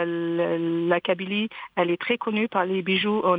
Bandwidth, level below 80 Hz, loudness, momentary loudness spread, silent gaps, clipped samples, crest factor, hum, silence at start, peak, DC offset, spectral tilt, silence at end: 4.9 kHz; -70 dBFS; -25 LUFS; 4 LU; none; under 0.1%; 16 dB; none; 0 s; -8 dBFS; under 0.1%; -8.5 dB/octave; 0 s